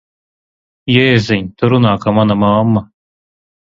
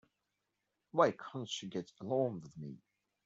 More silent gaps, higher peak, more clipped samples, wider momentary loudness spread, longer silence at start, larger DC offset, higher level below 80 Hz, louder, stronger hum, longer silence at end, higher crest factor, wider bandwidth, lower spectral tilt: neither; first, 0 dBFS vs -14 dBFS; neither; second, 6 LU vs 18 LU; about the same, 0.85 s vs 0.95 s; neither; first, -44 dBFS vs -80 dBFS; first, -12 LUFS vs -37 LUFS; neither; first, 0.85 s vs 0.5 s; second, 14 dB vs 24 dB; about the same, 7.6 kHz vs 8 kHz; first, -7.5 dB/octave vs -5.5 dB/octave